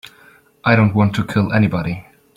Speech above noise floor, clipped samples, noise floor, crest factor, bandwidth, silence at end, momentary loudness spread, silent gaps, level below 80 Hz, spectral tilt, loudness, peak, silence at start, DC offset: 34 dB; under 0.1%; -49 dBFS; 16 dB; 12 kHz; 0.35 s; 11 LU; none; -48 dBFS; -8 dB/octave; -17 LUFS; -2 dBFS; 0.65 s; under 0.1%